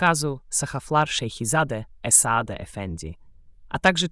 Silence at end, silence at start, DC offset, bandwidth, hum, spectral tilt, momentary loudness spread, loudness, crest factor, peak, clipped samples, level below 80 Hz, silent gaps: 0 s; 0 s; under 0.1%; 12 kHz; none; -3 dB/octave; 16 LU; -22 LUFS; 20 dB; -4 dBFS; under 0.1%; -48 dBFS; none